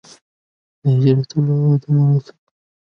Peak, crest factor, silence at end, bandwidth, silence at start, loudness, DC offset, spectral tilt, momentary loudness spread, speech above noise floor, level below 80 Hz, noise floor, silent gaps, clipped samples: -2 dBFS; 14 dB; 0.7 s; 6.4 kHz; 0.85 s; -17 LUFS; under 0.1%; -9.5 dB/octave; 5 LU; over 75 dB; -60 dBFS; under -90 dBFS; none; under 0.1%